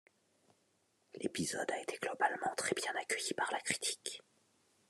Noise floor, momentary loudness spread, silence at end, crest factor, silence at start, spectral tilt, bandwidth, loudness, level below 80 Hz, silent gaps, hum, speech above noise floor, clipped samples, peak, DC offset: -77 dBFS; 8 LU; 0.7 s; 24 dB; 1.15 s; -2 dB/octave; 13 kHz; -38 LUFS; -80 dBFS; none; none; 38 dB; under 0.1%; -18 dBFS; under 0.1%